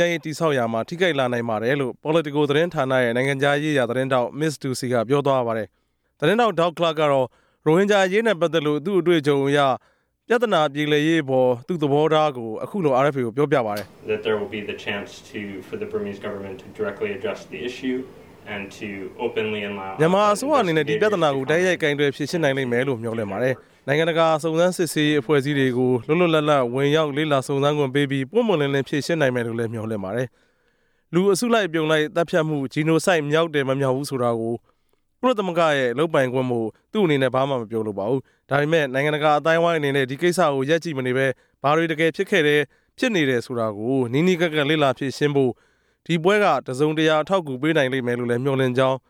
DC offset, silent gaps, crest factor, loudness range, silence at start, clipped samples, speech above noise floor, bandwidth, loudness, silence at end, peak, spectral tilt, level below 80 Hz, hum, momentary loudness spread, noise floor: under 0.1%; none; 16 dB; 4 LU; 0 s; under 0.1%; 45 dB; 17 kHz; -21 LUFS; 0.1 s; -4 dBFS; -5.5 dB/octave; -66 dBFS; none; 10 LU; -66 dBFS